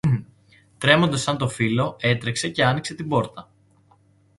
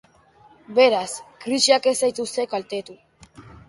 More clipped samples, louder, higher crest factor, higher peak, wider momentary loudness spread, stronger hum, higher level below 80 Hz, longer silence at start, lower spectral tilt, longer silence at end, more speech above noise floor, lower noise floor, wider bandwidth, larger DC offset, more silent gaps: neither; about the same, -22 LUFS vs -21 LUFS; about the same, 22 dB vs 22 dB; about the same, 0 dBFS vs -2 dBFS; second, 8 LU vs 15 LU; neither; first, -54 dBFS vs -62 dBFS; second, 0.05 s vs 0.7 s; first, -5 dB/octave vs -2 dB/octave; first, 0.95 s vs 0.2 s; about the same, 36 dB vs 33 dB; first, -58 dBFS vs -54 dBFS; about the same, 11.5 kHz vs 11.5 kHz; neither; neither